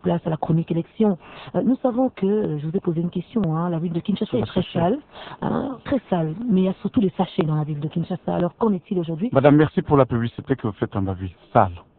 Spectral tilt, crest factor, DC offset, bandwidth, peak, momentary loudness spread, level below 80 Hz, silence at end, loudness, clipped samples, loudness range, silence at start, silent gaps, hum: -12 dB/octave; 22 dB; under 0.1%; 4.4 kHz; 0 dBFS; 8 LU; -50 dBFS; 0.2 s; -22 LUFS; under 0.1%; 4 LU; 0.05 s; none; none